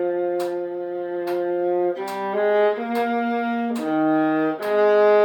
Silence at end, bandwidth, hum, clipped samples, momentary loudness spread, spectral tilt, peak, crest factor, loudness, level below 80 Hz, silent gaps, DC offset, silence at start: 0 s; 18 kHz; none; under 0.1%; 9 LU; -6 dB/octave; -8 dBFS; 14 dB; -22 LUFS; -78 dBFS; none; under 0.1%; 0 s